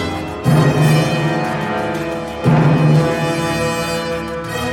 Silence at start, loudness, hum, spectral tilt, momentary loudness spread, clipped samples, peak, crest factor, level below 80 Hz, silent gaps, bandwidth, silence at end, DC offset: 0 s; -16 LUFS; none; -6.5 dB/octave; 9 LU; under 0.1%; -2 dBFS; 14 dB; -40 dBFS; none; 16.5 kHz; 0 s; under 0.1%